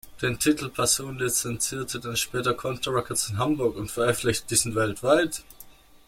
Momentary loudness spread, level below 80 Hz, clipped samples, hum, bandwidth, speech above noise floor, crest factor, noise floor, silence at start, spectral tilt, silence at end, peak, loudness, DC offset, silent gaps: 6 LU; -52 dBFS; under 0.1%; none; 16.5 kHz; 24 dB; 20 dB; -49 dBFS; 0.05 s; -3.5 dB/octave; 0.1 s; -6 dBFS; -25 LUFS; under 0.1%; none